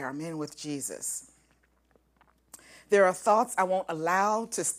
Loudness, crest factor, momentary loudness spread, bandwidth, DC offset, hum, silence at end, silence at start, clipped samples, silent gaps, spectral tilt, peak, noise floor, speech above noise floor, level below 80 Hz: -28 LUFS; 20 dB; 13 LU; 16 kHz; under 0.1%; none; 0 s; 0 s; under 0.1%; none; -3.5 dB/octave; -10 dBFS; -67 dBFS; 40 dB; -72 dBFS